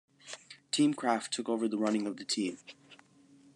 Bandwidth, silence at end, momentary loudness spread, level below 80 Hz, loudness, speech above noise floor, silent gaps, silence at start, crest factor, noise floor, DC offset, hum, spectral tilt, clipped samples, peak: 11 kHz; 0.6 s; 19 LU; -88 dBFS; -32 LUFS; 29 dB; none; 0.25 s; 20 dB; -61 dBFS; under 0.1%; none; -3.5 dB/octave; under 0.1%; -14 dBFS